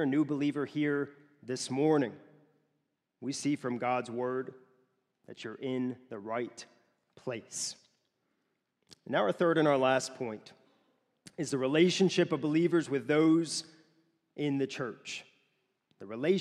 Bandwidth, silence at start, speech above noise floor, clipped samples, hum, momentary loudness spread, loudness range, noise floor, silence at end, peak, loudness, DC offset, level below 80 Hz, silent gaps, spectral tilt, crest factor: 12.5 kHz; 0 s; 50 dB; under 0.1%; none; 17 LU; 10 LU; -81 dBFS; 0 s; -14 dBFS; -31 LUFS; under 0.1%; -82 dBFS; none; -5 dB/octave; 20 dB